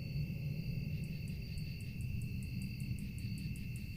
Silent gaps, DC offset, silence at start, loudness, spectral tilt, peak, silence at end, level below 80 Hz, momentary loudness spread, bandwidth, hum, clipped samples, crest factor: none; under 0.1%; 0 s; -42 LUFS; -6.5 dB/octave; -28 dBFS; 0 s; -50 dBFS; 3 LU; 15.5 kHz; none; under 0.1%; 12 dB